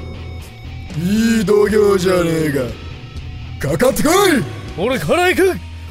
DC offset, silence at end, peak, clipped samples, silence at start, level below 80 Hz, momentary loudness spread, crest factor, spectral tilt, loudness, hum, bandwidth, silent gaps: under 0.1%; 0 s; 0 dBFS; under 0.1%; 0 s; -34 dBFS; 18 LU; 16 dB; -5 dB/octave; -15 LUFS; none; 16 kHz; none